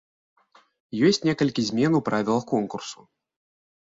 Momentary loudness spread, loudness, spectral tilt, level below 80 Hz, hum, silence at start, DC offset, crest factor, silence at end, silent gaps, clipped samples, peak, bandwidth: 14 LU; -23 LUFS; -5.5 dB/octave; -64 dBFS; none; 0.95 s; under 0.1%; 18 dB; 1.05 s; none; under 0.1%; -8 dBFS; 7.8 kHz